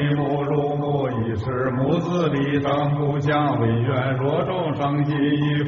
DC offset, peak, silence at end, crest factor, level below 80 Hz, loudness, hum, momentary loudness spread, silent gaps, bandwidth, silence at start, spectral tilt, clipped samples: under 0.1%; -8 dBFS; 0 s; 12 dB; -50 dBFS; -22 LUFS; none; 3 LU; none; 6.6 kHz; 0 s; -6.5 dB/octave; under 0.1%